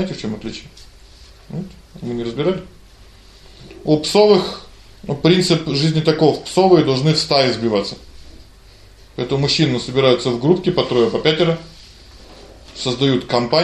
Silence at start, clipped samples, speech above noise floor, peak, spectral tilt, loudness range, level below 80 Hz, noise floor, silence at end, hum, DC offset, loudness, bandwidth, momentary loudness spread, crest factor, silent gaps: 0 s; under 0.1%; 27 dB; 0 dBFS; -5.5 dB/octave; 9 LU; -44 dBFS; -44 dBFS; 0 s; none; under 0.1%; -17 LUFS; 13 kHz; 17 LU; 18 dB; none